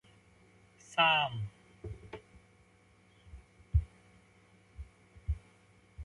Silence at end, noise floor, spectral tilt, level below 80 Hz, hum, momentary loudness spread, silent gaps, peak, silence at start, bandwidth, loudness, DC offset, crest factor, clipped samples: 0 s; -65 dBFS; -4.5 dB/octave; -46 dBFS; none; 29 LU; none; -14 dBFS; 0.9 s; 11.5 kHz; -32 LUFS; under 0.1%; 24 dB; under 0.1%